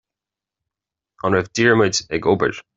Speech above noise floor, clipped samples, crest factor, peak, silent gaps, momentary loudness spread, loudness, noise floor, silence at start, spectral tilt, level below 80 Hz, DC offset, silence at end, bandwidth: 69 dB; under 0.1%; 20 dB; -2 dBFS; none; 5 LU; -18 LUFS; -88 dBFS; 1.25 s; -4.5 dB/octave; -54 dBFS; under 0.1%; 0.15 s; 8 kHz